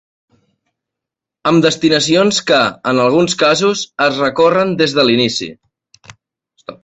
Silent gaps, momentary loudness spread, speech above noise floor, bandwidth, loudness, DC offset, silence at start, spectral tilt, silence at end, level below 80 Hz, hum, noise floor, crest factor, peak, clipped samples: none; 5 LU; 71 dB; 8.4 kHz; -13 LUFS; under 0.1%; 1.45 s; -4 dB/octave; 0.1 s; -54 dBFS; none; -83 dBFS; 14 dB; 0 dBFS; under 0.1%